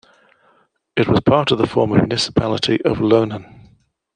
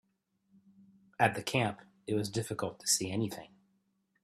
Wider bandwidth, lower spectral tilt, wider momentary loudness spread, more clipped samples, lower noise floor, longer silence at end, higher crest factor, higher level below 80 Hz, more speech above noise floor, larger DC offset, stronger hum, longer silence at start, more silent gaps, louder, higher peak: second, 10 kHz vs 15.5 kHz; first, -6 dB/octave vs -3.5 dB/octave; second, 7 LU vs 13 LU; neither; second, -59 dBFS vs -77 dBFS; about the same, 0.7 s vs 0.75 s; second, 18 dB vs 24 dB; first, -44 dBFS vs -70 dBFS; about the same, 42 dB vs 44 dB; neither; neither; second, 0.95 s vs 1.2 s; neither; first, -17 LUFS vs -33 LUFS; first, -2 dBFS vs -12 dBFS